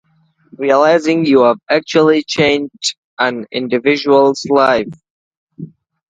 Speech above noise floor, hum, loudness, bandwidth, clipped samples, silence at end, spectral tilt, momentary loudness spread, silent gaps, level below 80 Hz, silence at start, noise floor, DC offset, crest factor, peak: 21 dB; none; -13 LUFS; 9.4 kHz; under 0.1%; 0.45 s; -4.5 dB/octave; 11 LU; 2.98-3.17 s, 5.10-5.31 s, 5.37-5.47 s; -58 dBFS; 0.6 s; -34 dBFS; under 0.1%; 14 dB; 0 dBFS